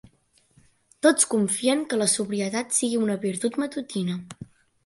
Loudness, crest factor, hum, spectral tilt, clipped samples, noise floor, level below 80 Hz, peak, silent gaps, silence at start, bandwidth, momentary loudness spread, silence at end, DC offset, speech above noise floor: -24 LUFS; 20 dB; none; -3.5 dB/octave; under 0.1%; -63 dBFS; -68 dBFS; -6 dBFS; none; 1.05 s; 12 kHz; 9 LU; 0.4 s; under 0.1%; 39 dB